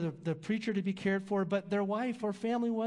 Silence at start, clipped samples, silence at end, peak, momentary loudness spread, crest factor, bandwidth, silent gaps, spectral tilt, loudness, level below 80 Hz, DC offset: 0 s; under 0.1%; 0 s; -20 dBFS; 3 LU; 14 dB; 11 kHz; none; -7.5 dB/octave; -34 LUFS; -78 dBFS; under 0.1%